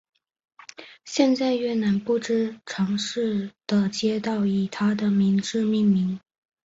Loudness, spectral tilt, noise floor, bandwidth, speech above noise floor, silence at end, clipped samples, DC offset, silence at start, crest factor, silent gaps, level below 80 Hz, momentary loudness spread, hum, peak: -24 LUFS; -6 dB/octave; -45 dBFS; 8 kHz; 23 dB; 0.45 s; under 0.1%; under 0.1%; 0.8 s; 18 dB; none; -64 dBFS; 9 LU; none; -6 dBFS